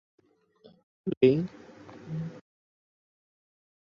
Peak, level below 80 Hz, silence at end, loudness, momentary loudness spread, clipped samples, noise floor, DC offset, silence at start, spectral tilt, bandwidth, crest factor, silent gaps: -8 dBFS; -70 dBFS; 1.55 s; -28 LUFS; 25 LU; under 0.1%; -60 dBFS; under 0.1%; 1.05 s; -9 dB/octave; 6.6 kHz; 24 dB; 1.17-1.21 s